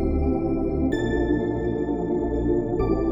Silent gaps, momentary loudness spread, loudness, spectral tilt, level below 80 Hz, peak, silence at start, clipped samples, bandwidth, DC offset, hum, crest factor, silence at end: none; 2 LU; -24 LUFS; -9 dB/octave; -32 dBFS; -10 dBFS; 0 s; under 0.1%; 7.4 kHz; under 0.1%; none; 12 dB; 0 s